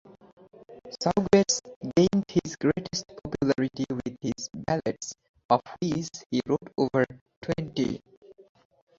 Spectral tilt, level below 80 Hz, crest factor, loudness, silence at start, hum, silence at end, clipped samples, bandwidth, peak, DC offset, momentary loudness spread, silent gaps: -5 dB/octave; -56 dBFS; 22 dB; -28 LUFS; 0.7 s; none; 0.65 s; under 0.1%; 7.8 kHz; -6 dBFS; under 0.1%; 13 LU; 1.76-1.81 s, 5.29-5.34 s, 5.45-5.49 s, 6.26-6.30 s, 7.21-7.26 s, 7.37-7.42 s, 8.17-8.22 s